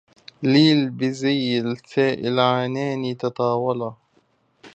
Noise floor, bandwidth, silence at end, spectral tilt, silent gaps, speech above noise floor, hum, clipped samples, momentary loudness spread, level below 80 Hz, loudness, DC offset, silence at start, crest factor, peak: -63 dBFS; 8.2 kHz; 0.05 s; -6.5 dB/octave; none; 43 dB; none; under 0.1%; 10 LU; -68 dBFS; -21 LUFS; under 0.1%; 0.4 s; 18 dB; -4 dBFS